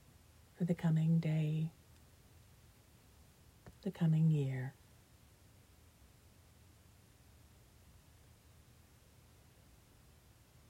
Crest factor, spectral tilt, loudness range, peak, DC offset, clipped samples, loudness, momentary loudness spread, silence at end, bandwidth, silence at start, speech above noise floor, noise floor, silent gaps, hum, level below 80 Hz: 18 dB; -8.5 dB/octave; 2 LU; -24 dBFS; under 0.1%; under 0.1%; -36 LUFS; 15 LU; 6 s; 11.5 kHz; 0.6 s; 30 dB; -64 dBFS; none; none; -68 dBFS